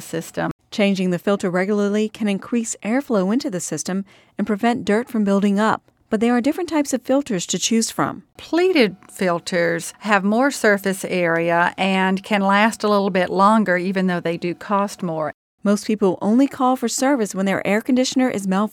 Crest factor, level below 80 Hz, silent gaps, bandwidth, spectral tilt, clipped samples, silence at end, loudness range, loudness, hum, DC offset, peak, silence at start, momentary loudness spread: 20 dB; -62 dBFS; 0.51-0.59 s, 15.34-15.58 s; 17 kHz; -5 dB/octave; under 0.1%; 0.05 s; 3 LU; -20 LUFS; none; under 0.1%; 0 dBFS; 0 s; 8 LU